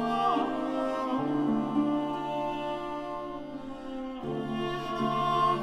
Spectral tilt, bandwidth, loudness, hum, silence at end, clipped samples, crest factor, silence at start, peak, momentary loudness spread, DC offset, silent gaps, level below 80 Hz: -6.5 dB/octave; 12 kHz; -31 LUFS; none; 0 s; under 0.1%; 14 dB; 0 s; -16 dBFS; 11 LU; under 0.1%; none; -56 dBFS